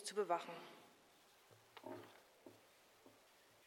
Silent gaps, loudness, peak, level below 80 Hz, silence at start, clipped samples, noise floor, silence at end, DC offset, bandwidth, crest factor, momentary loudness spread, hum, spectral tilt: none; -47 LUFS; -26 dBFS; under -90 dBFS; 0 s; under 0.1%; -70 dBFS; 0 s; under 0.1%; 17 kHz; 24 dB; 26 LU; none; -3 dB/octave